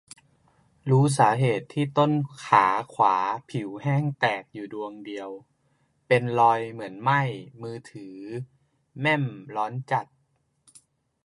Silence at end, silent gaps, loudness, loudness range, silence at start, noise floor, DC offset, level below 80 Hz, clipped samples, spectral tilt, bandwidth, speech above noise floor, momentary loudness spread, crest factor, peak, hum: 1.2 s; none; -24 LUFS; 8 LU; 0.85 s; -71 dBFS; under 0.1%; -70 dBFS; under 0.1%; -6.5 dB/octave; 11.5 kHz; 46 dB; 17 LU; 22 dB; -4 dBFS; none